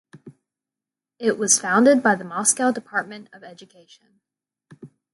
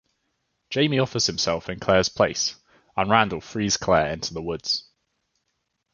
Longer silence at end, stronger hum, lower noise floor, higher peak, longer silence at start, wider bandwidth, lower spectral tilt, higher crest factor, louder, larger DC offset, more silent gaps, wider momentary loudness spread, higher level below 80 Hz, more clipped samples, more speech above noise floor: second, 0.25 s vs 1.15 s; neither; first, -89 dBFS vs -76 dBFS; about the same, -4 dBFS vs -2 dBFS; second, 0.25 s vs 0.7 s; first, 12 kHz vs 7.2 kHz; about the same, -3 dB/octave vs -3.5 dB/octave; about the same, 20 dB vs 24 dB; first, -19 LUFS vs -23 LUFS; neither; neither; first, 12 LU vs 9 LU; second, -74 dBFS vs -50 dBFS; neither; first, 67 dB vs 53 dB